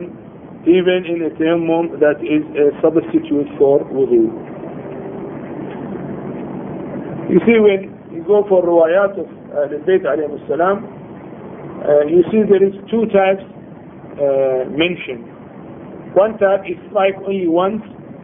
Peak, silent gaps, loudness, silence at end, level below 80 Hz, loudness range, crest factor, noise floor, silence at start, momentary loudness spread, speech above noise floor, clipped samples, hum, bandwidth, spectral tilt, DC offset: 0 dBFS; none; -16 LUFS; 0 s; -54 dBFS; 4 LU; 16 dB; -35 dBFS; 0 s; 20 LU; 21 dB; under 0.1%; none; 3.7 kHz; -11.5 dB/octave; under 0.1%